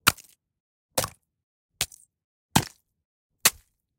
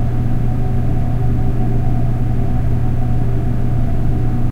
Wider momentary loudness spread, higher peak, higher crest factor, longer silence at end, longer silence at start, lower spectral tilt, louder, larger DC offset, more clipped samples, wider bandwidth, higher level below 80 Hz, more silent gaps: first, 12 LU vs 1 LU; first, 0 dBFS vs -4 dBFS; first, 30 dB vs 10 dB; first, 0.5 s vs 0 s; about the same, 0.05 s vs 0 s; second, -2 dB/octave vs -9.5 dB/octave; second, -26 LUFS vs -19 LUFS; neither; neither; first, 17 kHz vs 3.6 kHz; second, -54 dBFS vs -18 dBFS; first, 0.60-0.89 s, 1.43-1.69 s, 2.24-2.49 s, 3.05-3.30 s vs none